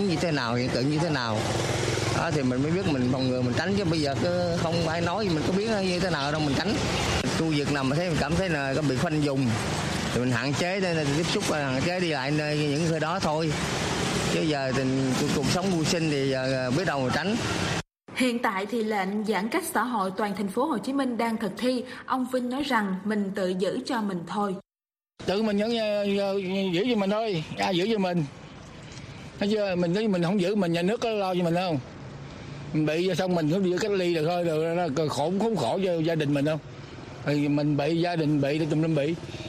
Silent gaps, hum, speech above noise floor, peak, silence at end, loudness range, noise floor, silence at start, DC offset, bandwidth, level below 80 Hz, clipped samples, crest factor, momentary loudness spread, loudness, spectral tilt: none; none; over 64 dB; -8 dBFS; 0 s; 2 LU; under -90 dBFS; 0 s; under 0.1%; 15 kHz; -50 dBFS; under 0.1%; 18 dB; 5 LU; -26 LUFS; -5.5 dB/octave